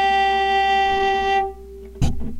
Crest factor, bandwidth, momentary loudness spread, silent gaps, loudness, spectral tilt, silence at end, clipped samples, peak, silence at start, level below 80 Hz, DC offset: 12 dB; 12 kHz; 13 LU; none; -19 LUFS; -5 dB/octave; 0 s; under 0.1%; -6 dBFS; 0 s; -32 dBFS; under 0.1%